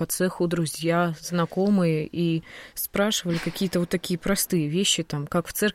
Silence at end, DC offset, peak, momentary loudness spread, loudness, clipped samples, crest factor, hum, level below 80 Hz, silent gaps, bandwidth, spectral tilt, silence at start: 0 s; under 0.1%; -10 dBFS; 5 LU; -25 LUFS; under 0.1%; 16 dB; none; -52 dBFS; none; 16.5 kHz; -4.5 dB/octave; 0 s